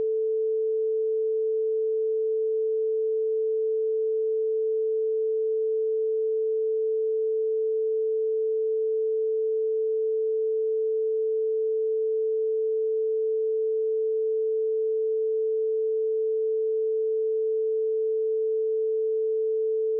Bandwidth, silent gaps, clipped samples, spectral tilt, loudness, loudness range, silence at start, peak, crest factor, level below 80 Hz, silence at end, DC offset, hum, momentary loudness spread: 0.6 kHz; none; under 0.1%; 2 dB/octave; -26 LUFS; 0 LU; 0 s; -22 dBFS; 4 dB; under -90 dBFS; 0 s; under 0.1%; none; 0 LU